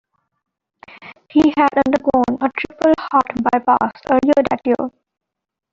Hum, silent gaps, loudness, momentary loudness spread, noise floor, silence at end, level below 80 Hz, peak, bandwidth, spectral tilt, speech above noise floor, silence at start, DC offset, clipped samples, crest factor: none; none; -16 LUFS; 6 LU; -45 dBFS; 0.85 s; -50 dBFS; -2 dBFS; 7.6 kHz; -6.5 dB/octave; 29 dB; 1 s; under 0.1%; under 0.1%; 16 dB